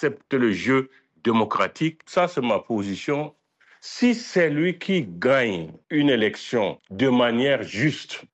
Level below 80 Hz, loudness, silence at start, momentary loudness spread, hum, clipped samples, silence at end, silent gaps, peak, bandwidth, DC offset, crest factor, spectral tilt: -68 dBFS; -23 LUFS; 0 s; 8 LU; none; under 0.1%; 0.1 s; none; -8 dBFS; 8.4 kHz; under 0.1%; 14 dB; -6 dB/octave